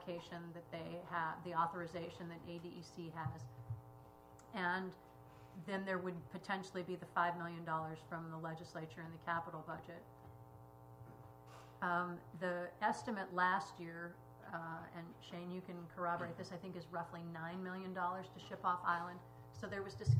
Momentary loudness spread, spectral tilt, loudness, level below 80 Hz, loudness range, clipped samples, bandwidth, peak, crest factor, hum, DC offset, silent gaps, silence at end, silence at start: 19 LU; -6.5 dB/octave; -44 LUFS; -72 dBFS; 6 LU; under 0.1%; 15.5 kHz; -22 dBFS; 22 dB; 60 Hz at -65 dBFS; under 0.1%; none; 0 s; 0 s